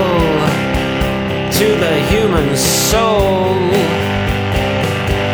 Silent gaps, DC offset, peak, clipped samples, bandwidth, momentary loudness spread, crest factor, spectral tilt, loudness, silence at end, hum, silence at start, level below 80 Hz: none; under 0.1%; 0 dBFS; under 0.1%; over 20 kHz; 4 LU; 12 dB; -4.5 dB/octave; -14 LUFS; 0 s; none; 0 s; -26 dBFS